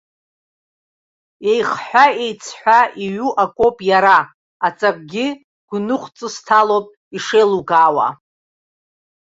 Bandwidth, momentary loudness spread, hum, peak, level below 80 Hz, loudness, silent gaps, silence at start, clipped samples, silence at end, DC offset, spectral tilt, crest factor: 8 kHz; 12 LU; none; 0 dBFS; -60 dBFS; -16 LUFS; 4.34-4.60 s, 5.44-5.68 s, 6.97-7.11 s; 1.4 s; under 0.1%; 1.15 s; under 0.1%; -4 dB/octave; 16 dB